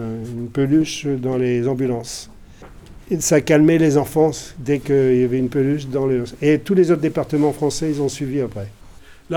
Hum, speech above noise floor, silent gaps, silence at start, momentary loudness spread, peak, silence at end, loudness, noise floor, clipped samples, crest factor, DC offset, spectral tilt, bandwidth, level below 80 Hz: none; 24 dB; none; 0 s; 11 LU; -2 dBFS; 0 s; -19 LUFS; -42 dBFS; under 0.1%; 16 dB; under 0.1%; -6 dB/octave; 17.5 kHz; -46 dBFS